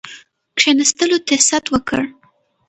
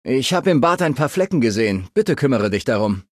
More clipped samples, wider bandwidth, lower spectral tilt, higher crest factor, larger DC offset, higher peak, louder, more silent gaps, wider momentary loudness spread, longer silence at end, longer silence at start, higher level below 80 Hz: neither; second, 9 kHz vs 14.5 kHz; second, -1.5 dB/octave vs -5.5 dB/octave; about the same, 18 dB vs 14 dB; neither; first, 0 dBFS vs -4 dBFS; first, -15 LUFS vs -18 LUFS; neither; first, 12 LU vs 4 LU; first, 0.6 s vs 0.1 s; about the same, 0.05 s vs 0.05 s; about the same, -48 dBFS vs -46 dBFS